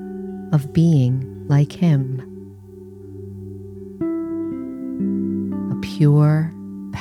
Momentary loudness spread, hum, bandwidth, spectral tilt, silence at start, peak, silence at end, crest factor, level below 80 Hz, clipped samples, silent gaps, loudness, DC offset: 21 LU; none; 9.2 kHz; -9 dB/octave; 0 s; -4 dBFS; 0 s; 16 dB; -54 dBFS; under 0.1%; none; -20 LUFS; under 0.1%